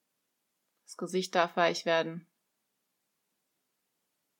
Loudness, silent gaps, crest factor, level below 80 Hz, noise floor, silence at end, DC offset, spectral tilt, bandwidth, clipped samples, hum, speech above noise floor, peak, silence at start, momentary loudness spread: -30 LUFS; none; 24 dB; under -90 dBFS; -81 dBFS; 2.2 s; under 0.1%; -4 dB/octave; 17.5 kHz; under 0.1%; none; 51 dB; -10 dBFS; 0.9 s; 18 LU